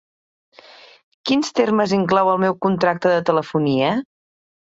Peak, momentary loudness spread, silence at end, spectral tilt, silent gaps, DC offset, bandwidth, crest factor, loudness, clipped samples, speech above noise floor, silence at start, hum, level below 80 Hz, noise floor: -2 dBFS; 4 LU; 0.75 s; -6 dB/octave; none; under 0.1%; 8 kHz; 18 dB; -18 LUFS; under 0.1%; 28 dB; 1.25 s; none; -60 dBFS; -46 dBFS